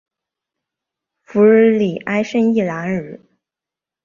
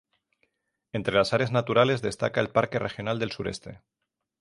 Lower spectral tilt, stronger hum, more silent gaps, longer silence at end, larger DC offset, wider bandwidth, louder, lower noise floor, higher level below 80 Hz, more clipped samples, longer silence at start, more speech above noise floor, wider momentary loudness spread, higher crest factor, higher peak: first, -7.5 dB/octave vs -5.5 dB/octave; neither; neither; first, 0.9 s vs 0.65 s; neither; second, 7.2 kHz vs 11.5 kHz; first, -16 LUFS vs -26 LUFS; first, -87 dBFS vs -74 dBFS; about the same, -60 dBFS vs -58 dBFS; neither; first, 1.3 s vs 0.95 s; first, 73 dB vs 48 dB; about the same, 13 LU vs 12 LU; second, 16 dB vs 22 dB; first, -2 dBFS vs -6 dBFS